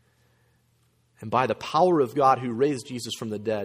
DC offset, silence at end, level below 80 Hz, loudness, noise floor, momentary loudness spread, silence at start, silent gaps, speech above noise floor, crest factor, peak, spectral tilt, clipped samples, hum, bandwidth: under 0.1%; 0 s; -66 dBFS; -24 LUFS; -66 dBFS; 11 LU; 1.2 s; none; 42 dB; 18 dB; -8 dBFS; -5.5 dB/octave; under 0.1%; none; 15.5 kHz